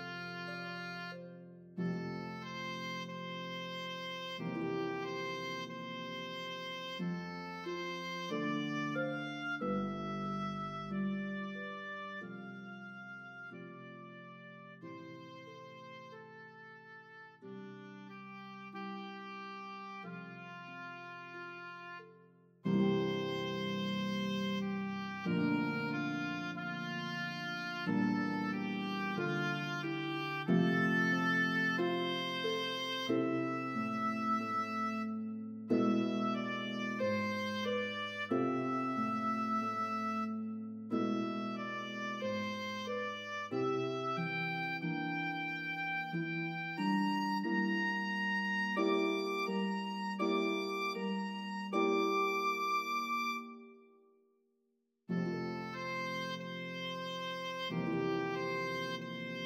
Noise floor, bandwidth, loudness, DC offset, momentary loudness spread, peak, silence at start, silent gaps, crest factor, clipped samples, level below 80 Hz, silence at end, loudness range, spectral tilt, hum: -80 dBFS; 15.5 kHz; -37 LUFS; under 0.1%; 16 LU; -20 dBFS; 0 s; none; 18 dB; under 0.1%; -78 dBFS; 0 s; 13 LU; -6 dB/octave; none